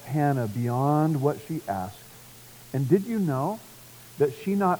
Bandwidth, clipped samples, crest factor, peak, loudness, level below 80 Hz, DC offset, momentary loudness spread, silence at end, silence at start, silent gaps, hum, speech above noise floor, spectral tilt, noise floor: over 20 kHz; under 0.1%; 18 dB; -8 dBFS; -26 LUFS; -66 dBFS; under 0.1%; 22 LU; 0 s; 0 s; none; none; 23 dB; -8 dB/octave; -48 dBFS